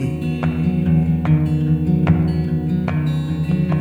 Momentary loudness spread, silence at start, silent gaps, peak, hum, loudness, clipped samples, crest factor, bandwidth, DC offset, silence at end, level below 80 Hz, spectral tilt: 4 LU; 0 s; none; -2 dBFS; none; -18 LUFS; under 0.1%; 14 dB; 4.7 kHz; under 0.1%; 0 s; -34 dBFS; -9.5 dB/octave